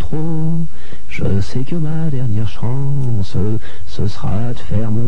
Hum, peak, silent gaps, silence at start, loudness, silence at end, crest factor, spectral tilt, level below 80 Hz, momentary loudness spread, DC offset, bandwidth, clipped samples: none; -2 dBFS; none; 0 s; -21 LUFS; 0 s; 12 dB; -8 dB/octave; -34 dBFS; 5 LU; 40%; 10.5 kHz; under 0.1%